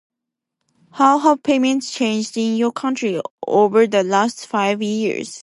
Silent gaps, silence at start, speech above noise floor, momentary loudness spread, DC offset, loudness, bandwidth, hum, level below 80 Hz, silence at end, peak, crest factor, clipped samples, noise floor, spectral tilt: 3.31-3.38 s; 0.95 s; 65 dB; 7 LU; under 0.1%; -18 LUFS; 11.5 kHz; none; -70 dBFS; 0.05 s; -2 dBFS; 16 dB; under 0.1%; -82 dBFS; -4.5 dB/octave